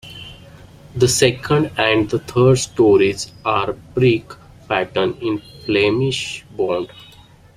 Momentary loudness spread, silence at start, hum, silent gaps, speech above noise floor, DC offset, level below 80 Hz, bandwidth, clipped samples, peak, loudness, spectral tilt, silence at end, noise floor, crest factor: 12 LU; 0.05 s; none; none; 28 dB; under 0.1%; -48 dBFS; 15.5 kHz; under 0.1%; 0 dBFS; -18 LUFS; -5 dB/octave; 0.55 s; -45 dBFS; 18 dB